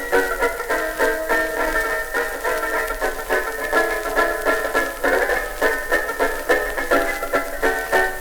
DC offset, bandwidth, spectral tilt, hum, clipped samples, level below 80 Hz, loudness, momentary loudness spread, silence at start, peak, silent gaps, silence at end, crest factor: under 0.1%; 19 kHz; -2.5 dB/octave; none; under 0.1%; -36 dBFS; -20 LUFS; 4 LU; 0 s; -4 dBFS; none; 0 s; 16 dB